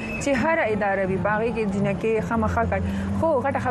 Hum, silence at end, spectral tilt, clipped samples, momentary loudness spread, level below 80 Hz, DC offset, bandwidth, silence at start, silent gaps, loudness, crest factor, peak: none; 0 s; -6.5 dB/octave; under 0.1%; 3 LU; -42 dBFS; under 0.1%; 12.5 kHz; 0 s; none; -23 LUFS; 14 dB; -8 dBFS